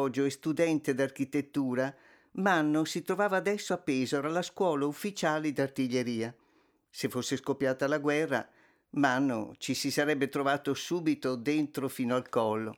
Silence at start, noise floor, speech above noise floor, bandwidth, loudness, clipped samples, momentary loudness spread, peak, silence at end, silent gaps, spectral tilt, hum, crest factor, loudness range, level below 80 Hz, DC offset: 0 s; -69 dBFS; 38 dB; 18 kHz; -31 LUFS; under 0.1%; 6 LU; -12 dBFS; 0 s; none; -5 dB/octave; none; 18 dB; 2 LU; -78 dBFS; under 0.1%